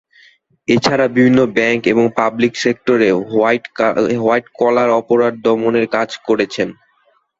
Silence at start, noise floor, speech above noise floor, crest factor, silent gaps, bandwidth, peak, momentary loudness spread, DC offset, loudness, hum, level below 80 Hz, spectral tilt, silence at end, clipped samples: 0.7 s; -58 dBFS; 44 dB; 14 dB; none; 8 kHz; 0 dBFS; 5 LU; under 0.1%; -15 LUFS; none; -54 dBFS; -5.5 dB/octave; 0.65 s; under 0.1%